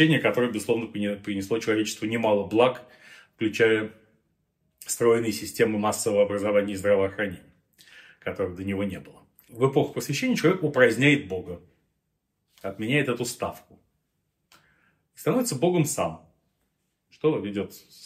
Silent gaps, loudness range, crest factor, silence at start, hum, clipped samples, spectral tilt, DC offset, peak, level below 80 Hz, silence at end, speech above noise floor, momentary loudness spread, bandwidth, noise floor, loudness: none; 5 LU; 22 dB; 0 s; none; under 0.1%; -5 dB/octave; under 0.1%; -4 dBFS; -64 dBFS; 0 s; 52 dB; 13 LU; 16 kHz; -77 dBFS; -25 LUFS